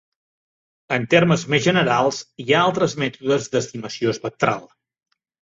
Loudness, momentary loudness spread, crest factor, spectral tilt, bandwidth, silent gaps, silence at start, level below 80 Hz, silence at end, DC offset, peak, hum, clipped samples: -20 LUFS; 8 LU; 18 dB; -5 dB/octave; 7.8 kHz; none; 0.9 s; -58 dBFS; 0.85 s; under 0.1%; -2 dBFS; none; under 0.1%